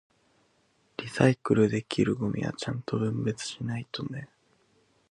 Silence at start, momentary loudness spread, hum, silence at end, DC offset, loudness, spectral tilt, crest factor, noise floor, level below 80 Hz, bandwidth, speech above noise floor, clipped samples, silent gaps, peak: 1 s; 13 LU; none; 0.85 s; under 0.1%; -29 LUFS; -6.5 dB/octave; 24 dB; -68 dBFS; -60 dBFS; 11 kHz; 41 dB; under 0.1%; none; -6 dBFS